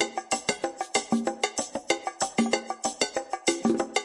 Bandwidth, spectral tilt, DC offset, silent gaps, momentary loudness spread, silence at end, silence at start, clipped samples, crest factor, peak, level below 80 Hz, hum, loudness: 11.5 kHz; -2 dB/octave; under 0.1%; none; 4 LU; 0 s; 0 s; under 0.1%; 20 dB; -8 dBFS; -66 dBFS; none; -28 LUFS